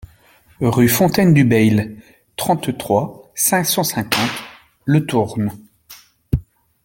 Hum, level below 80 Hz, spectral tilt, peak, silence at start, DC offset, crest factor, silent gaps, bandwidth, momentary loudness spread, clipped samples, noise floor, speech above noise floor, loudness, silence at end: none; -42 dBFS; -5 dB/octave; 0 dBFS; 0.6 s; under 0.1%; 18 dB; none; 17 kHz; 12 LU; under 0.1%; -51 dBFS; 35 dB; -17 LUFS; 0.45 s